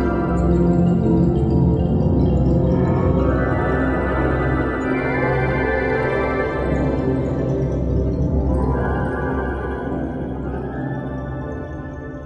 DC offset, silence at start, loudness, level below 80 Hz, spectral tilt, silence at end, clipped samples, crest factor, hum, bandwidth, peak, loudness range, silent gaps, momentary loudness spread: under 0.1%; 0 s; -20 LUFS; -26 dBFS; -9.5 dB/octave; 0 s; under 0.1%; 14 dB; none; 8 kHz; -4 dBFS; 6 LU; none; 9 LU